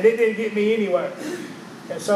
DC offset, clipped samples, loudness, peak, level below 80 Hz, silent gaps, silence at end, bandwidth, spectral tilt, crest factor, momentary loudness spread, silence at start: under 0.1%; under 0.1%; -23 LUFS; -4 dBFS; -74 dBFS; none; 0 s; 13.5 kHz; -5 dB/octave; 16 dB; 15 LU; 0 s